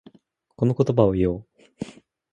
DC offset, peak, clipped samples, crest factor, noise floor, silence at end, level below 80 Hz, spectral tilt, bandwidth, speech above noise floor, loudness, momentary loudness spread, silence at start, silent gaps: under 0.1%; -2 dBFS; under 0.1%; 22 dB; -59 dBFS; 0.4 s; -46 dBFS; -9.5 dB/octave; 9.4 kHz; 37 dB; -22 LUFS; 18 LU; 0.6 s; none